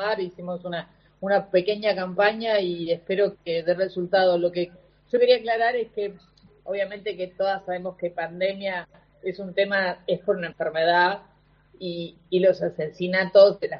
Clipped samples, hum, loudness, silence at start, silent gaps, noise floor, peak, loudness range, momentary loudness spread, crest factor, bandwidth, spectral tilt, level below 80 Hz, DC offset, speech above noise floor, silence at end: under 0.1%; 50 Hz at -60 dBFS; -24 LUFS; 0 s; none; -57 dBFS; -4 dBFS; 5 LU; 14 LU; 20 dB; 5.8 kHz; -3 dB/octave; -64 dBFS; under 0.1%; 34 dB; 0 s